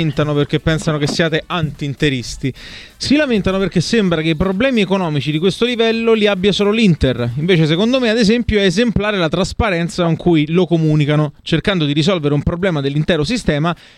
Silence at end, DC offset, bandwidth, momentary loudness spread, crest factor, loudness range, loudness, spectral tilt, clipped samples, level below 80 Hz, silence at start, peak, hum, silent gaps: 0.25 s; under 0.1%; 11.5 kHz; 5 LU; 14 dB; 3 LU; -15 LUFS; -6 dB/octave; under 0.1%; -34 dBFS; 0 s; 0 dBFS; none; none